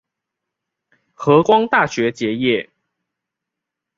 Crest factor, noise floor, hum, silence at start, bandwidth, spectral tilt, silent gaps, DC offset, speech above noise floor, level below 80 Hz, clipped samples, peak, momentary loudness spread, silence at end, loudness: 18 dB; -83 dBFS; none; 1.2 s; 7.6 kHz; -5.5 dB/octave; none; under 0.1%; 67 dB; -60 dBFS; under 0.1%; -2 dBFS; 8 LU; 1.35 s; -16 LUFS